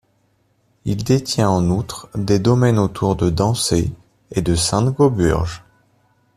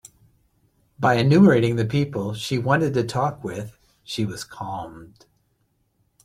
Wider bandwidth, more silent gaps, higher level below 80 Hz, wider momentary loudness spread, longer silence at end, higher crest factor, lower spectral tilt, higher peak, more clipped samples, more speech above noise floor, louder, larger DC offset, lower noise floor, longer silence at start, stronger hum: about the same, 15 kHz vs 15 kHz; neither; first, -38 dBFS vs -56 dBFS; second, 11 LU vs 18 LU; second, 0.8 s vs 1.2 s; about the same, 16 dB vs 20 dB; about the same, -6 dB/octave vs -6.5 dB/octave; about the same, -2 dBFS vs -4 dBFS; neither; about the same, 45 dB vs 47 dB; first, -18 LUFS vs -21 LUFS; neither; second, -62 dBFS vs -68 dBFS; second, 0.85 s vs 1 s; neither